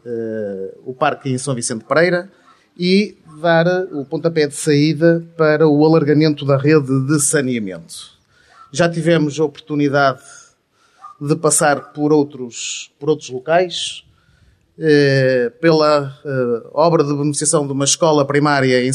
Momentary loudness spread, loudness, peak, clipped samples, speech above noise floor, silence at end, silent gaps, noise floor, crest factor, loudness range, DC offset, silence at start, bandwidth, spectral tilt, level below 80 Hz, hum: 11 LU; -16 LUFS; -2 dBFS; under 0.1%; 42 dB; 0 s; none; -57 dBFS; 16 dB; 5 LU; under 0.1%; 0.05 s; 14 kHz; -5 dB/octave; -62 dBFS; none